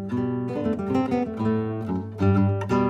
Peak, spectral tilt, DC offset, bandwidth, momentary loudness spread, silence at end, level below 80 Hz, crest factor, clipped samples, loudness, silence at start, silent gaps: -10 dBFS; -9 dB/octave; under 0.1%; 7.8 kHz; 6 LU; 0 s; -52 dBFS; 14 dB; under 0.1%; -25 LUFS; 0 s; none